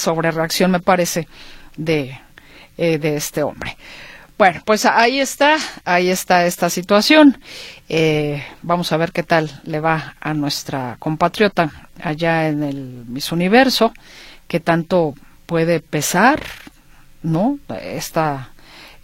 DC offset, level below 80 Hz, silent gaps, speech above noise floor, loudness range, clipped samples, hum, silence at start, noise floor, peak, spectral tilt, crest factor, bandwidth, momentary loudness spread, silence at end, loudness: under 0.1%; -48 dBFS; none; 28 dB; 5 LU; under 0.1%; none; 0 s; -45 dBFS; 0 dBFS; -4.5 dB/octave; 18 dB; 16.5 kHz; 15 LU; 0.15 s; -17 LUFS